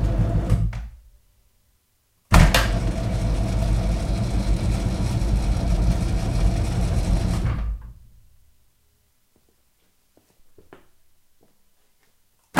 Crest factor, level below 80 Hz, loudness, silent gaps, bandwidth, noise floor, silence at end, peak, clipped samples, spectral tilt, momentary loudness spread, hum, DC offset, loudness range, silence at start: 24 dB; -26 dBFS; -23 LUFS; none; 15.5 kHz; -66 dBFS; 0 s; 0 dBFS; under 0.1%; -6 dB/octave; 8 LU; none; under 0.1%; 7 LU; 0 s